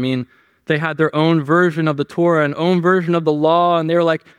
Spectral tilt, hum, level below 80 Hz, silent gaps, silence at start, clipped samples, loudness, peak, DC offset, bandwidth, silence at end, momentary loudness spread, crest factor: -7.5 dB/octave; none; -66 dBFS; none; 0 s; under 0.1%; -16 LUFS; -2 dBFS; under 0.1%; 10 kHz; 0.2 s; 6 LU; 14 dB